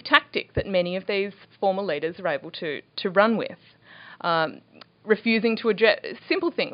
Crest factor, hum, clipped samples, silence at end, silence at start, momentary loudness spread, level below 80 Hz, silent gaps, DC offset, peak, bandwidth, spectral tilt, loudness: 24 dB; none; under 0.1%; 0 s; 0.05 s; 10 LU; -56 dBFS; none; under 0.1%; 0 dBFS; 5.4 kHz; -2.5 dB/octave; -24 LUFS